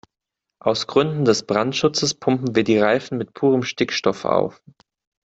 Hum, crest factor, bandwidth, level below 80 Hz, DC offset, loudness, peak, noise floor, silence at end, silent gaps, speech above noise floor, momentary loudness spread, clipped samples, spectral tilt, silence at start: none; 18 dB; 8 kHz; -58 dBFS; under 0.1%; -20 LUFS; -2 dBFS; -84 dBFS; 0.8 s; none; 64 dB; 5 LU; under 0.1%; -4.5 dB/octave; 0.65 s